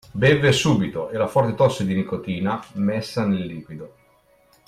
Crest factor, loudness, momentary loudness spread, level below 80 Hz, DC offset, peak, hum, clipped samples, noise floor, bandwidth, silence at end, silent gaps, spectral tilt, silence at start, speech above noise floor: 16 dB; -21 LUFS; 12 LU; -52 dBFS; under 0.1%; -6 dBFS; none; under 0.1%; -58 dBFS; 14.5 kHz; 0.8 s; none; -6 dB/octave; 0.15 s; 37 dB